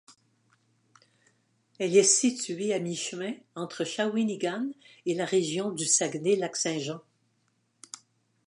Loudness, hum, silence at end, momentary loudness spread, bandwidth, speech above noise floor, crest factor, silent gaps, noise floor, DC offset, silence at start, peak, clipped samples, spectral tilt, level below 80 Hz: -28 LUFS; none; 1.5 s; 16 LU; 11.5 kHz; 45 dB; 22 dB; none; -73 dBFS; under 0.1%; 0.1 s; -8 dBFS; under 0.1%; -3 dB/octave; -82 dBFS